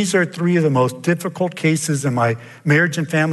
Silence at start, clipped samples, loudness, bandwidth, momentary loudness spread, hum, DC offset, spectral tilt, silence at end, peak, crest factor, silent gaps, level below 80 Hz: 0 s; under 0.1%; -18 LUFS; 12.5 kHz; 5 LU; none; under 0.1%; -5.5 dB/octave; 0 s; -4 dBFS; 14 dB; none; -64 dBFS